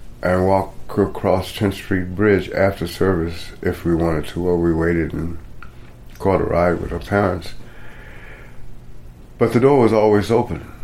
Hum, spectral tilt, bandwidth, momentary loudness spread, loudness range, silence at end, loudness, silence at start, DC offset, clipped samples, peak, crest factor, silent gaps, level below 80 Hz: none; -7.5 dB/octave; 16 kHz; 13 LU; 3 LU; 0 s; -19 LUFS; 0 s; under 0.1%; under 0.1%; -2 dBFS; 18 dB; none; -36 dBFS